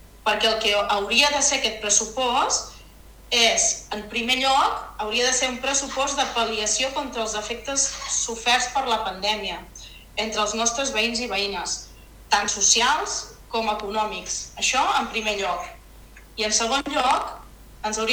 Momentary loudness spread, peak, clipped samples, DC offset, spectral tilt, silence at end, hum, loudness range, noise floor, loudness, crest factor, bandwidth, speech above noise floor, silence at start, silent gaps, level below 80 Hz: 11 LU; -2 dBFS; under 0.1%; under 0.1%; 0 dB/octave; 0 s; none; 4 LU; -46 dBFS; -22 LUFS; 22 dB; over 20 kHz; 23 dB; 0.15 s; none; -48 dBFS